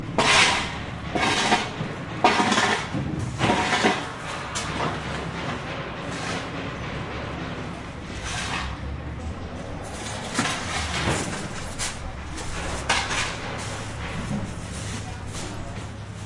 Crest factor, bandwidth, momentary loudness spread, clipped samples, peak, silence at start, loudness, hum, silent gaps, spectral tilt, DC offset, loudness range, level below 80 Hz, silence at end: 24 dB; 11.5 kHz; 14 LU; under 0.1%; -4 dBFS; 0 s; -26 LUFS; none; none; -3.5 dB/octave; under 0.1%; 9 LU; -40 dBFS; 0 s